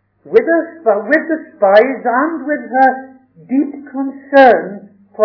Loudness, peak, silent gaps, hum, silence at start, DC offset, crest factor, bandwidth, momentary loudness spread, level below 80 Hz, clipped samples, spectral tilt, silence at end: -13 LUFS; 0 dBFS; none; none; 0.25 s; under 0.1%; 14 dB; 5.4 kHz; 14 LU; -62 dBFS; 0.7%; -7 dB/octave; 0 s